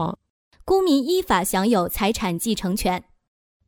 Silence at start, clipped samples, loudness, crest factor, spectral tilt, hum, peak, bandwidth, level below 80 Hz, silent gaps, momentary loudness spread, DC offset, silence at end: 0 s; under 0.1%; -22 LUFS; 16 dB; -4.5 dB/octave; none; -6 dBFS; over 20 kHz; -42 dBFS; 0.30-0.51 s; 10 LU; under 0.1%; 0.65 s